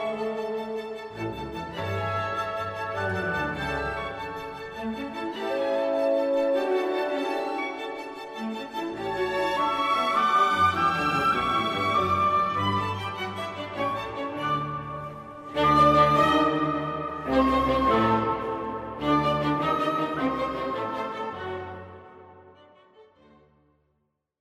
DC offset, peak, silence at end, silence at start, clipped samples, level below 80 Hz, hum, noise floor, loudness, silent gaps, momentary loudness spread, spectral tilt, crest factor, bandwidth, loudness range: under 0.1%; -8 dBFS; 1.4 s; 0 s; under 0.1%; -50 dBFS; none; -75 dBFS; -26 LUFS; none; 13 LU; -6 dB/octave; 18 dB; 15.5 kHz; 8 LU